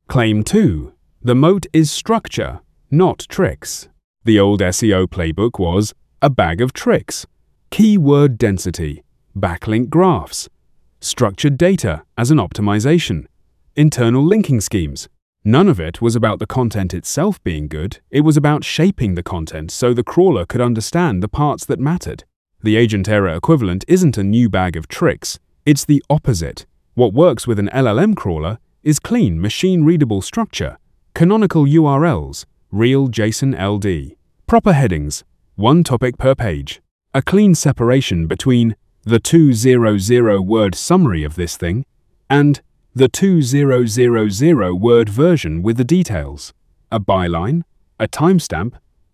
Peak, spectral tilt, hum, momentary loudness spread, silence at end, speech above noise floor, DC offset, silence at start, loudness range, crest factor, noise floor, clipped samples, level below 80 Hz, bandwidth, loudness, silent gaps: 0 dBFS; -6 dB/octave; none; 13 LU; 0.35 s; 38 dB; under 0.1%; 0.1 s; 3 LU; 14 dB; -52 dBFS; under 0.1%; -34 dBFS; 15.5 kHz; -15 LUFS; 4.04-4.14 s, 15.22-15.33 s, 22.36-22.45 s, 36.91-36.99 s